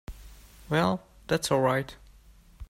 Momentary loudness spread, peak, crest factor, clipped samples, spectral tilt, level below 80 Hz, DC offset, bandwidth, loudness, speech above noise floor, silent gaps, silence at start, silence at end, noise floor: 14 LU; -10 dBFS; 20 dB; under 0.1%; -5 dB/octave; -50 dBFS; under 0.1%; 16 kHz; -28 LUFS; 29 dB; none; 0.1 s; 0.05 s; -55 dBFS